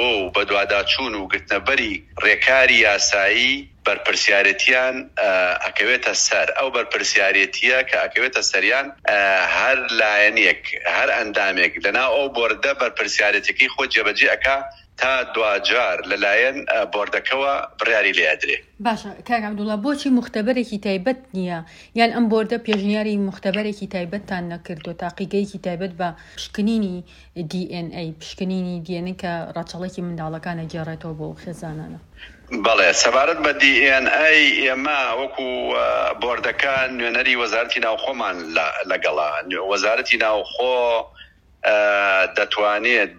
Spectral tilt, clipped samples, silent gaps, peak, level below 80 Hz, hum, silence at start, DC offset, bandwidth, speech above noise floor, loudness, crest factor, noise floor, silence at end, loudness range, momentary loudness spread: -3 dB/octave; under 0.1%; none; 0 dBFS; -52 dBFS; none; 0 s; under 0.1%; 11.5 kHz; 28 dB; -18 LUFS; 20 dB; -48 dBFS; 0.05 s; 11 LU; 14 LU